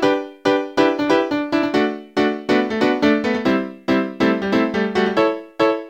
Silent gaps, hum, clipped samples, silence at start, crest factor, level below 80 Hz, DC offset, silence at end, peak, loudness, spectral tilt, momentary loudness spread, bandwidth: none; none; under 0.1%; 0 s; 16 dB; -54 dBFS; under 0.1%; 0 s; -2 dBFS; -19 LUFS; -6 dB/octave; 3 LU; 16 kHz